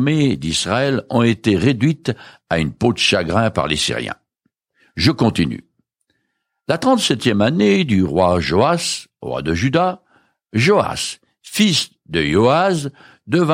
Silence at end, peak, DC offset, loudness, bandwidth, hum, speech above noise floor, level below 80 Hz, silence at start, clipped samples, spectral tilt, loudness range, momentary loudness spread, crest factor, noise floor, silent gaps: 0 s; -2 dBFS; under 0.1%; -17 LUFS; 16 kHz; none; 56 dB; -44 dBFS; 0 s; under 0.1%; -5 dB/octave; 3 LU; 11 LU; 16 dB; -73 dBFS; none